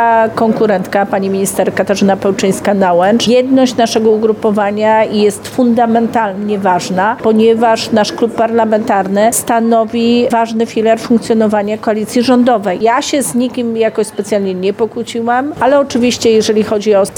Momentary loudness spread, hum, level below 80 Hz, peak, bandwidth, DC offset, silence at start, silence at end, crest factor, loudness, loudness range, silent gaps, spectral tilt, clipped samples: 5 LU; none; -50 dBFS; 0 dBFS; 19 kHz; under 0.1%; 0 s; 0 s; 10 dB; -12 LUFS; 2 LU; none; -4.5 dB/octave; under 0.1%